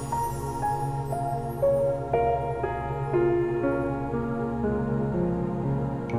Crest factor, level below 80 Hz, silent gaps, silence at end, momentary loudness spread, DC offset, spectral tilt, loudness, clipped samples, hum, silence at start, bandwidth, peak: 14 dB; -42 dBFS; none; 0 s; 5 LU; under 0.1%; -8.5 dB/octave; -27 LUFS; under 0.1%; none; 0 s; 15.5 kHz; -12 dBFS